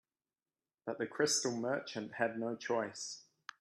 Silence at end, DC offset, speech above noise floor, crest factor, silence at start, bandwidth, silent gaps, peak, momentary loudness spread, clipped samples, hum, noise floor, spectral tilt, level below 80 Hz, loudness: 0.4 s; under 0.1%; over 53 dB; 20 dB; 0.85 s; 13 kHz; none; -18 dBFS; 14 LU; under 0.1%; none; under -90 dBFS; -2.5 dB/octave; -84 dBFS; -37 LUFS